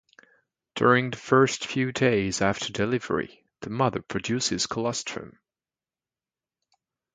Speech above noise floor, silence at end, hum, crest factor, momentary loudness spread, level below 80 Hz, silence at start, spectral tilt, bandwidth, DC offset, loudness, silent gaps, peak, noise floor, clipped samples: over 65 dB; 1.85 s; none; 22 dB; 14 LU; -58 dBFS; 0.75 s; -4.5 dB/octave; 9.6 kHz; under 0.1%; -25 LUFS; none; -6 dBFS; under -90 dBFS; under 0.1%